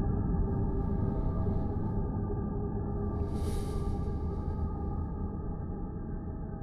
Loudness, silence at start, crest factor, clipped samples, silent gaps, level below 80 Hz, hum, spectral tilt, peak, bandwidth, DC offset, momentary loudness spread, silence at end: -35 LUFS; 0 s; 14 dB; under 0.1%; none; -36 dBFS; none; -9.5 dB/octave; -20 dBFS; 12 kHz; under 0.1%; 7 LU; 0 s